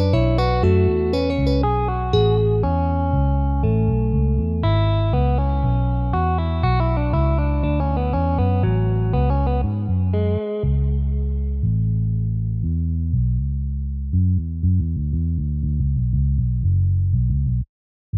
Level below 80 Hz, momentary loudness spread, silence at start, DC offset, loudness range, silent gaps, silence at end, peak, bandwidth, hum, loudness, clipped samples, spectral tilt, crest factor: -24 dBFS; 5 LU; 0 s; under 0.1%; 3 LU; 17.69-18.13 s; 0 s; -6 dBFS; 5.8 kHz; none; -21 LUFS; under 0.1%; -10 dB/octave; 14 dB